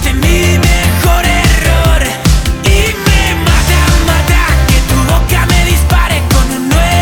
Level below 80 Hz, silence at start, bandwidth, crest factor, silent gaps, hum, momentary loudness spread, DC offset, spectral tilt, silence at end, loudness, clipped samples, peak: -12 dBFS; 0 s; 19.5 kHz; 8 dB; none; none; 2 LU; under 0.1%; -4.5 dB/octave; 0 s; -10 LUFS; 0.2%; 0 dBFS